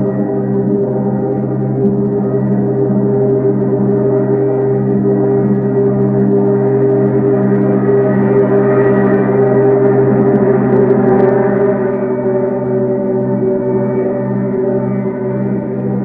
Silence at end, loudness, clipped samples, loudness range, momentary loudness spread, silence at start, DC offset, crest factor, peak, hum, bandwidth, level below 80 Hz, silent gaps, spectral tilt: 0 s; -13 LUFS; under 0.1%; 4 LU; 5 LU; 0 s; under 0.1%; 12 dB; 0 dBFS; none; 2.8 kHz; -44 dBFS; none; -13 dB/octave